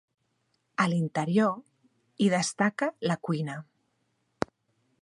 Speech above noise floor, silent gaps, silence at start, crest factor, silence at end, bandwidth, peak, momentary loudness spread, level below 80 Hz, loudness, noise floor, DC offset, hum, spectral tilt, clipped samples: 48 dB; none; 0.8 s; 24 dB; 1.4 s; 11.5 kHz; -6 dBFS; 11 LU; -70 dBFS; -29 LUFS; -75 dBFS; under 0.1%; none; -5.5 dB/octave; under 0.1%